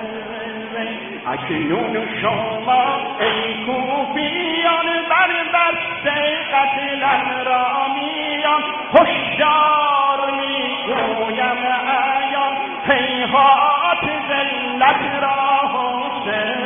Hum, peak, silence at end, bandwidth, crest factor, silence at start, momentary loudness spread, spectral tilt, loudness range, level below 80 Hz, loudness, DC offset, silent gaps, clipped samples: none; 0 dBFS; 0 s; 3.7 kHz; 18 dB; 0 s; 8 LU; -7.5 dB/octave; 3 LU; -56 dBFS; -17 LUFS; under 0.1%; none; under 0.1%